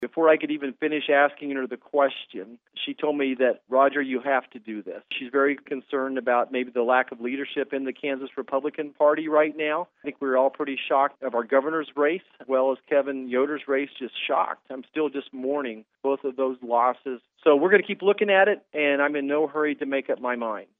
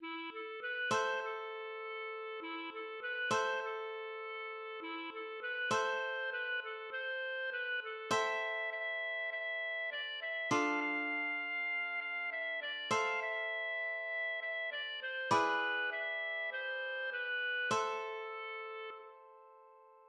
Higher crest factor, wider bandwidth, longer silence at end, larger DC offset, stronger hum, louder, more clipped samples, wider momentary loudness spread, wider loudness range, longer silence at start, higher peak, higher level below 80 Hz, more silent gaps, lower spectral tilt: about the same, 20 dB vs 20 dB; second, 4 kHz vs 11.5 kHz; first, 0.15 s vs 0 s; neither; neither; first, -25 LUFS vs -37 LUFS; neither; about the same, 11 LU vs 9 LU; about the same, 5 LU vs 4 LU; about the same, 0 s vs 0 s; first, -6 dBFS vs -18 dBFS; about the same, -86 dBFS vs -86 dBFS; neither; first, -8 dB/octave vs -2.5 dB/octave